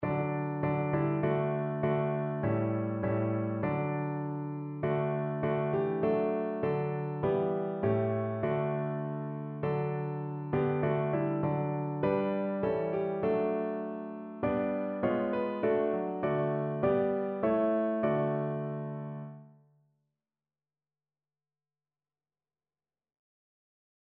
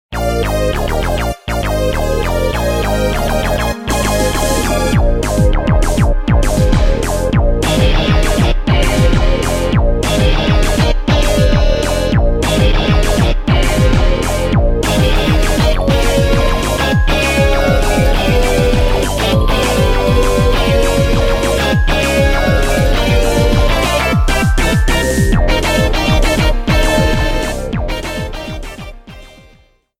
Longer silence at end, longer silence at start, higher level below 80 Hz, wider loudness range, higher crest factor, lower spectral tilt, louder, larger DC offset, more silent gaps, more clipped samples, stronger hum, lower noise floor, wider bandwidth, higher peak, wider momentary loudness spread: first, 4.55 s vs 0.7 s; about the same, 0 s vs 0.1 s; second, -64 dBFS vs -16 dBFS; about the same, 3 LU vs 2 LU; first, 16 dB vs 10 dB; first, -8.5 dB/octave vs -5 dB/octave; second, -32 LUFS vs -14 LUFS; neither; neither; neither; neither; first, under -90 dBFS vs -48 dBFS; second, 4.3 kHz vs 16 kHz; second, -16 dBFS vs 0 dBFS; about the same, 6 LU vs 4 LU